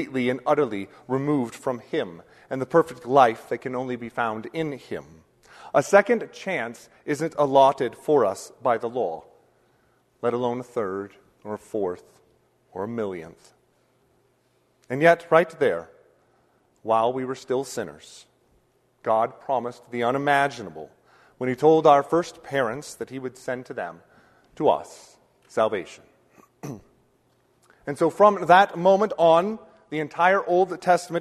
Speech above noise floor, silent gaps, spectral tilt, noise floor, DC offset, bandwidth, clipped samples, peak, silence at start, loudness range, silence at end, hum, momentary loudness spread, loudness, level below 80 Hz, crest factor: 43 dB; none; -5.5 dB/octave; -66 dBFS; under 0.1%; 13.5 kHz; under 0.1%; -2 dBFS; 0 s; 10 LU; 0 s; none; 18 LU; -23 LUFS; -68 dBFS; 24 dB